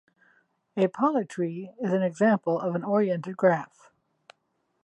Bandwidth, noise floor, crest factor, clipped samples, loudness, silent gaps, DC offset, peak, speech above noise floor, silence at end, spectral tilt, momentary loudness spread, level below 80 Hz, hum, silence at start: 11 kHz; -75 dBFS; 20 dB; under 0.1%; -26 LUFS; none; under 0.1%; -8 dBFS; 49 dB; 1.2 s; -8 dB/octave; 9 LU; -80 dBFS; none; 0.75 s